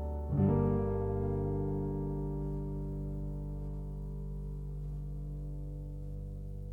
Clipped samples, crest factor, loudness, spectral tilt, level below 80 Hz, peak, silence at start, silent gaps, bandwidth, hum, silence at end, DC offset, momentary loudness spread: under 0.1%; 18 dB; -37 LUFS; -11.5 dB/octave; -42 dBFS; -18 dBFS; 0 s; none; 3 kHz; 50 Hz at -55 dBFS; 0 s; under 0.1%; 13 LU